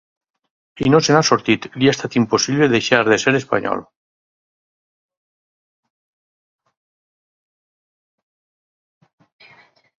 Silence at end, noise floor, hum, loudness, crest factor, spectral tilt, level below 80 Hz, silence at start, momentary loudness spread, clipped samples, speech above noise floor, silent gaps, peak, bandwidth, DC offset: 6.15 s; -51 dBFS; none; -16 LUFS; 22 dB; -4.5 dB/octave; -56 dBFS; 0.75 s; 7 LU; under 0.1%; 35 dB; none; 0 dBFS; 7.6 kHz; under 0.1%